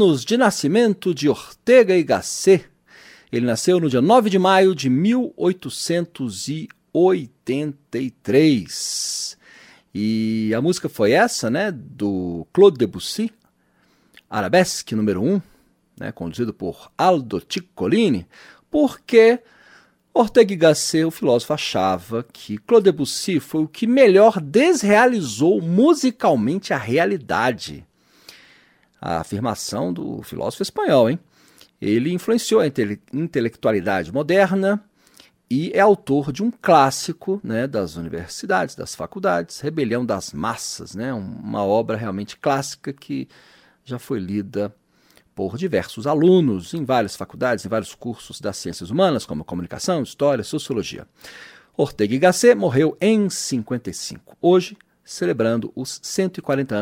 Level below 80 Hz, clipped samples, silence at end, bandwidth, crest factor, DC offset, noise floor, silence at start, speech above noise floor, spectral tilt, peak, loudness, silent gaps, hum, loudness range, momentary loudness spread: -56 dBFS; under 0.1%; 0 s; 16.5 kHz; 18 dB; under 0.1%; -61 dBFS; 0 s; 42 dB; -5 dB/octave; -2 dBFS; -20 LUFS; none; none; 7 LU; 14 LU